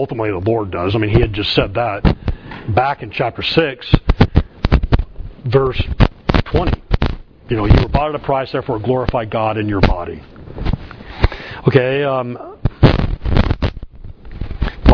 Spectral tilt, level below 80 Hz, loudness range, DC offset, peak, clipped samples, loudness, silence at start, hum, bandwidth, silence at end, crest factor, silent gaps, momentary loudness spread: -8.5 dB/octave; -22 dBFS; 2 LU; under 0.1%; 0 dBFS; under 0.1%; -17 LUFS; 0 s; none; 5.4 kHz; 0 s; 16 dB; none; 13 LU